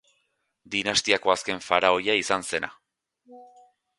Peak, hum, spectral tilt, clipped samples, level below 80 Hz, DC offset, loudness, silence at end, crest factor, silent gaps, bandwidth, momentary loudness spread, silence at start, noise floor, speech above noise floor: -2 dBFS; none; -2 dB/octave; under 0.1%; -62 dBFS; under 0.1%; -24 LUFS; 0.55 s; 24 dB; none; 11.5 kHz; 9 LU; 0.7 s; -74 dBFS; 49 dB